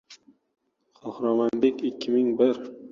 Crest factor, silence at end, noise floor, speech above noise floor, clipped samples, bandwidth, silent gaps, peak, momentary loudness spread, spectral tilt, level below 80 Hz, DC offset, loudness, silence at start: 18 dB; 0 s; -54 dBFS; 30 dB; under 0.1%; 7.4 kHz; none; -8 dBFS; 13 LU; -6.5 dB/octave; -70 dBFS; under 0.1%; -25 LUFS; 0.1 s